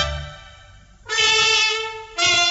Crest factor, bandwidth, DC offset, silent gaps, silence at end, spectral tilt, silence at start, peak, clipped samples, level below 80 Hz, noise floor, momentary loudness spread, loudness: 16 dB; 8.2 kHz; under 0.1%; none; 0 s; -0.5 dB/octave; 0 s; -6 dBFS; under 0.1%; -40 dBFS; -47 dBFS; 16 LU; -17 LUFS